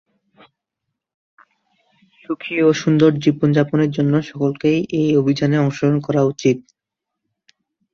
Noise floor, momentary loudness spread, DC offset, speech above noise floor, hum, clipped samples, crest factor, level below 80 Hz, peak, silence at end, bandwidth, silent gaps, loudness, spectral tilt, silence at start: -82 dBFS; 6 LU; under 0.1%; 66 dB; none; under 0.1%; 16 dB; -58 dBFS; -2 dBFS; 1.35 s; 7.2 kHz; none; -17 LUFS; -7.5 dB/octave; 2.3 s